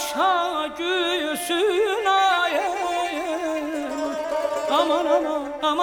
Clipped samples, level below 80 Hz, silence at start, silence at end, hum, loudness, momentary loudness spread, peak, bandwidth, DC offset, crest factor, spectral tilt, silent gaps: under 0.1%; -58 dBFS; 0 s; 0 s; none; -22 LUFS; 7 LU; -8 dBFS; 20 kHz; under 0.1%; 16 dB; -1.5 dB/octave; none